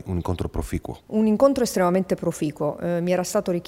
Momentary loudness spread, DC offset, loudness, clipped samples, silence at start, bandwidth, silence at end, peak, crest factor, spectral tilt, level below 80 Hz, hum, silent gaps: 10 LU; under 0.1%; -23 LUFS; under 0.1%; 0.05 s; 16 kHz; 0.05 s; -6 dBFS; 18 dB; -6 dB/octave; -42 dBFS; none; none